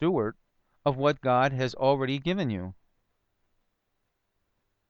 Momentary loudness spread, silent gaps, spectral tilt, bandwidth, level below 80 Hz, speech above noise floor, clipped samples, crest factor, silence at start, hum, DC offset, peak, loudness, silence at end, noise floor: 9 LU; none; -7 dB/octave; 7.4 kHz; -60 dBFS; 52 dB; under 0.1%; 18 dB; 0 s; none; under 0.1%; -12 dBFS; -27 LUFS; 2.15 s; -78 dBFS